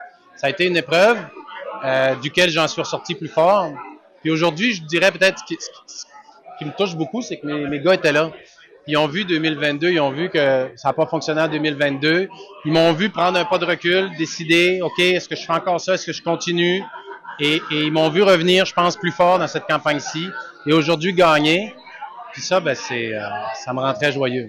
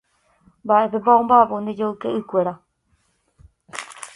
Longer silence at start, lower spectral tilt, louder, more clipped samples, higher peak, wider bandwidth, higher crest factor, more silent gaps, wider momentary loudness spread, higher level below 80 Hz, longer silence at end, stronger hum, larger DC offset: second, 0 s vs 0.65 s; second, -4.5 dB/octave vs -6 dB/octave; about the same, -18 LUFS vs -19 LUFS; neither; second, -6 dBFS vs 0 dBFS; first, 15.5 kHz vs 11.5 kHz; second, 14 dB vs 20 dB; neither; second, 14 LU vs 20 LU; about the same, -62 dBFS vs -60 dBFS; about the same, 0 s vs 0.1 s; neither; neither